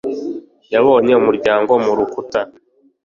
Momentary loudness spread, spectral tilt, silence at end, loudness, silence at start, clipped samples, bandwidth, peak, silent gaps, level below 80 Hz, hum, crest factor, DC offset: 15 LU; -6.5 dB/octave; 0.55 s; -15 LUFS; 0.05 s; under 0.1%; 7.2 kHz; -2 dBFS; none; -56 dBFS; none; 14 dB; under 0.1%